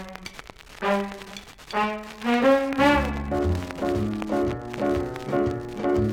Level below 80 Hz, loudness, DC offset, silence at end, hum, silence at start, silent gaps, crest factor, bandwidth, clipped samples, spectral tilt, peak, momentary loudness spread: -40 dBFS; -25 LUFS; under 0.1%; 0 s; none; 0 s; none; 18 dB; 17 kHz; under 0.1%; -6.5 dB/octave; -8 dBFS; 18 LU